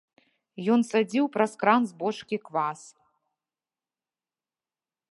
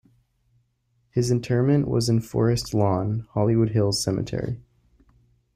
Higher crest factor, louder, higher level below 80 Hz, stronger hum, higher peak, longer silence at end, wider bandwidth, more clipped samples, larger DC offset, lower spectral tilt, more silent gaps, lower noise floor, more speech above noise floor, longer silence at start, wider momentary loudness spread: first, 22 dB vs 16 dB; second, -26 LUFS vs -23 LUFS; second, -82 dBFS vs -50 dBFS; neither; about the same, -6 dBFS vs -8 dBFS; first, 2.4 s vs 0.95 s; second, 11.5 kHz vs 15 kHz; neither; neither; about the same, -5.5 dB/octave vs -6.5 dB/octave; neither; first, under -90 dBFS vs -69 dBFS; first, over 64 dB vs 47 dB; second, 0.6 s vs 1.15 s; about the same, 10 LU vs 8 LU